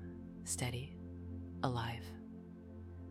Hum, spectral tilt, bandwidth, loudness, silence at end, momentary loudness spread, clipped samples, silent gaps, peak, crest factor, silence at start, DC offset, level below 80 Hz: none; -4.5 dB/octave; 16 kHz; -44 LUFS; 0 s; 13 LU; under 0.1%; none; -20 dBFS; 24 dB; 0 s; under 0.1%; -64 dBFS